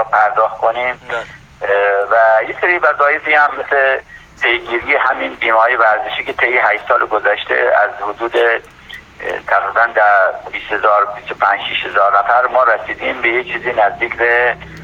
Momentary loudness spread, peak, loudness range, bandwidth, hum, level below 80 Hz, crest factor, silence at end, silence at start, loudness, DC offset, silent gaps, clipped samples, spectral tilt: 9 LU; 0 dBFS; 2 LU; 8.6 kHz; none; -50 dBFS; 14 dB; 0 s; 0 s; -14 LUFS; under 0.1%; none; under 0.1%; -4.5 dB/octave